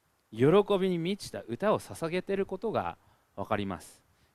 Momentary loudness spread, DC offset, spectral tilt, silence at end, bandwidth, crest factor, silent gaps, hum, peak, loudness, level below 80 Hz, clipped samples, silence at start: 16 LU; under 0.1%; -6.5 dB/octave; 0.45 s; 14 kHz; 20 dB; none; none; -10 dBFS; -30 LUFS; -62 dBFS; under 0.1%; 0.3 s